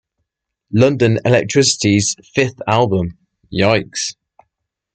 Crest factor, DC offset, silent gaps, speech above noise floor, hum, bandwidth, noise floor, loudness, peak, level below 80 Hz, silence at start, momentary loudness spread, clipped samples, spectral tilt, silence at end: 16 dB; under 0.1%; none; 61 dB; none; 9.2 kHz; -76 dBFS; -16 LUFS; 0 dBFS; -50 dBFS; 0.7 s; 10 LU; under 0.1%; -4.5 dB/octave; 0.85 s